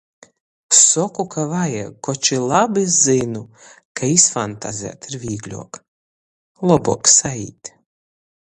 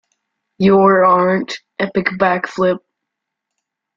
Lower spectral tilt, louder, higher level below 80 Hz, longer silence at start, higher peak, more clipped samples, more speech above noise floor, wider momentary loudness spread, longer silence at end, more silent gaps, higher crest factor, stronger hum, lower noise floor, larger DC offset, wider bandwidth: second, -3 dB/octave vs -7 dB/octave; about the same, -16 LUFS vs -14 LUFS; about the same, -54 dBFS vs -54 dBFS; about the same, 0.7 s vs 0.6 s; about the same, 0 dBFS vs -2 dBFS; neither; first, over 72 dB vs 65 dB; first, 20 LU vs 11 LU; second, 0.75 s vs 1.2 s; first, 3.85-3.95 s, 5.88-6.55 s vs none; about the same, 20 dB vs 16 dB; neither; first, under -90 dBFS vs -79 dBFS; neither; first, 11.5 kHz vs 7.4 kHz